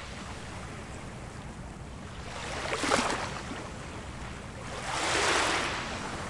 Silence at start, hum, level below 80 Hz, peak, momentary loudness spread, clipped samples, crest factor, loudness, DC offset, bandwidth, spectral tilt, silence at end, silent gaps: 0 s; none; -48 dBFS; -10 dBFS; 16 LU; under 0.1%; 24 dB; -32 LUFS; under 0.1%; 11.5 kHz; -3 dB/octave; 0 s; none